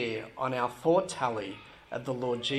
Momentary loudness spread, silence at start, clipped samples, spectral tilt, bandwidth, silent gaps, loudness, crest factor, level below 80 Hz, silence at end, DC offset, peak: 14 LU; 0 s; under 0.1%; -5 dB/octave; 13 kHz; none; -31 LUFS; 18 dB; -66 dBFS; 0 s; under 0.1%; -14 dBFS